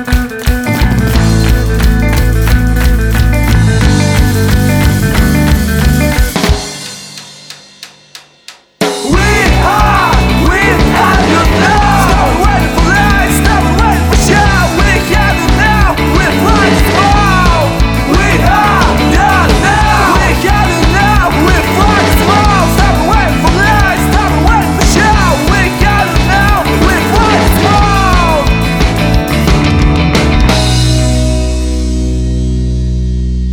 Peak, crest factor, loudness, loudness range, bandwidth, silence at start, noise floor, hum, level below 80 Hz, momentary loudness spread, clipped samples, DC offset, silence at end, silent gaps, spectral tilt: 0 dBFS; 8 dB; -9 LUFS; 3 LU; 19.5 kHz; 0 s; -37 dBFS; none; -14 dBFS; 6 LU; under 0.1%; under 0.1%; 0 s; none; -5 dB/octave